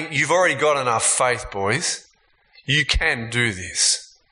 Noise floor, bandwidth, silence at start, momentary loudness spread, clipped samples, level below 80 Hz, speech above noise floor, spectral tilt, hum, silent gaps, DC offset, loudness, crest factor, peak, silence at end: -60 dBFS; 11 kHz; 0 s; 7 LU; under 0.1%; -36 dBFS; 39 dB; -2 dB/octave; none; none; under 0.1%; -19 LUFS; 18 dB; -4 dBFS; 0.25 s